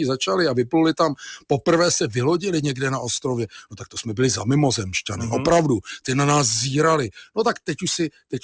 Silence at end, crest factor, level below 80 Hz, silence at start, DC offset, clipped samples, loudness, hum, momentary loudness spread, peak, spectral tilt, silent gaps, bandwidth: 0.05 s; 16 dB; -50 dBFS; 0 s; under 0.1%; under 0.1%; -21 LUFS; none; 9 LU; -6 dBFS; -4.5 dB/octave; none; 8 kHz